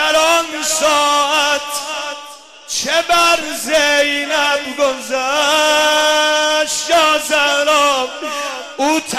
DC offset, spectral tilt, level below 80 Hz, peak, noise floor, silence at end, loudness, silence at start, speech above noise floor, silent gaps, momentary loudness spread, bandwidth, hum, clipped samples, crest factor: 0.2%; 0 dB/octave; -52 dBFS; -2 dBFS; -36 dBFS; 0 s; -14 LUFS; 0 s; 21 dB; none; 10 LU; 14.5 kHz; none; under 0.1%; 12 dB